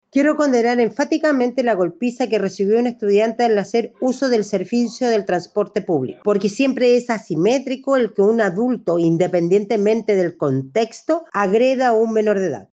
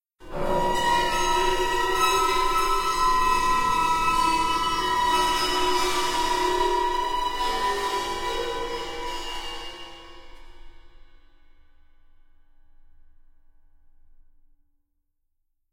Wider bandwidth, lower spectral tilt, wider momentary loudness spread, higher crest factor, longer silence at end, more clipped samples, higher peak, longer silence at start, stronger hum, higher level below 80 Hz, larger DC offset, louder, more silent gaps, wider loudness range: second, 8.4 kHz vs 16.5 kHz; first, -6 dB/octave vs -2.5 dB/octave; second, 5 LU vs 11 LU; about the same, 14 dB vs 16 dB; second, 0.1 s vs 4.85 s; neither; first, -4 dBFS vs -10 dBFS; about the same, 0.15 s vs 0.2 s; neither; second, -66 dBFS vs -40 dBFS; neither; first, -18 LUFS vs -24 LUFS; neither; second, 1 LU vs 14 LU